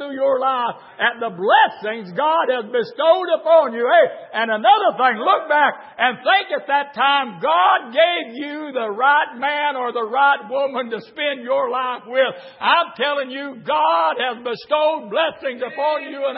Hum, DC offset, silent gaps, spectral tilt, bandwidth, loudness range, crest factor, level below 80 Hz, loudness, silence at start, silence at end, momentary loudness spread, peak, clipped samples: none; under 0.1%; none; -8 dB/octave; 5.8 kHz; 4 LU; 16 dB; -78 dBFS; -18 LUFS; 0 s; 0 s; 9 LU; -2 dBFS; under 0.1%